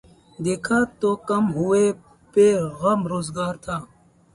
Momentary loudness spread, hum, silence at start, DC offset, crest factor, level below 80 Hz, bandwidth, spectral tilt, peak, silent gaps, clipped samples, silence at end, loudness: 12 LU; none; 0.4 s; under 0.1%; 16 dB; -54 dBFS; 11.5 kHz; -6 dB/octave; -6 dBFS; none; under 0.1%; 0.5 s; -22 LUFS